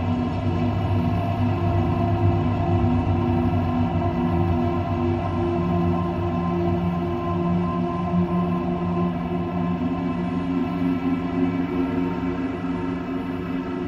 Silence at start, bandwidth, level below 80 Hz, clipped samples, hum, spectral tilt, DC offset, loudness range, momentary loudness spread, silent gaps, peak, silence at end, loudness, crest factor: 0 s; 6.6 kHz; -38 dBFS; under 0.1%; none; -9.5 dB/octave; under 0.1%; 2 LU; 4 LU; none; -6 dBFS; 0 s; -24 LUFS; 16 dB